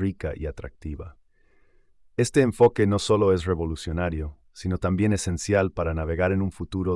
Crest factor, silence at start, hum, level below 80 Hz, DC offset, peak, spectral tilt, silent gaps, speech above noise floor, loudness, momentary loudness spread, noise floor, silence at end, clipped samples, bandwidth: 16 dB; 0 s; none; -42 dBFS; under 0.1%; -8 dBFS; -6 dB/octave; none; 35 dB; -24 LUFS; 17 LU; -59 dBFS; 0 s; under 0.1%; 12 kHz